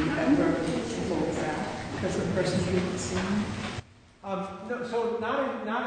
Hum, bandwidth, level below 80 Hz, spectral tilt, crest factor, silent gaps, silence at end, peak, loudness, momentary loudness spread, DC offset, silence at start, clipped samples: none; 9.6 kHz; -50 dBFS; -5.5 dB/octave; 16 dB; none; 0 s; -12 dBFS; -29 LUFS; 10 LU; under 0.1%; 0 s; under 0.1%